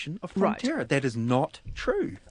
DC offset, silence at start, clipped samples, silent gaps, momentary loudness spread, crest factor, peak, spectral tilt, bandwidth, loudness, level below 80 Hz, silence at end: under 0.1%; 0 s; under 0.1%; none; 7 LU; 18 dB; -10 dBFS; -6.5 dB/octave; 10.5 kHz; -28 LUFS; -48 dBFS; 0 s